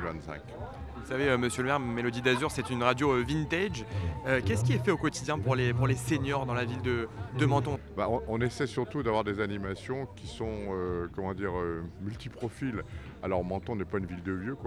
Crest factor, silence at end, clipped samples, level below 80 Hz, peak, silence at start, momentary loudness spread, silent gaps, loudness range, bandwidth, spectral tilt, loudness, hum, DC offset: 22 dB; 0 s; under 0.1%; -48 dBFS; -10 dBFS; 0 s; 11 LU; none; 6 LU; 13.5 kHz; -6 dB/octave; -31 LUFS; none; under 0.1%